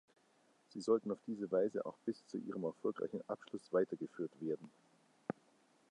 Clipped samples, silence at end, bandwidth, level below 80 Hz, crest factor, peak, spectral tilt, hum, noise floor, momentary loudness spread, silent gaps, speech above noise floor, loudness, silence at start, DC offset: under 0.1%; 0.6 s; 10.5 kHz; -86 dBFS; 20 dB; -22 dBFS; -7 dB/octave; none; -73 dBFS; 11 LU; none; 33 dB; -41 LUFS; 0.75 s; under 0.1%